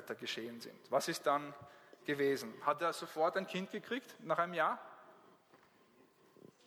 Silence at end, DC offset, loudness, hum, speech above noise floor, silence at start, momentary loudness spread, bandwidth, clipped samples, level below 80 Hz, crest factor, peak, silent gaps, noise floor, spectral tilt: 1.1 s; under 0.1%; -38 LUFS; none; 30 dB; 0 s; 15 LU; over 20 kHz; under 0.1%; -88 dBFS; 22 dB; -18 dBFS; none; -68 dBFS; -4 dB/octave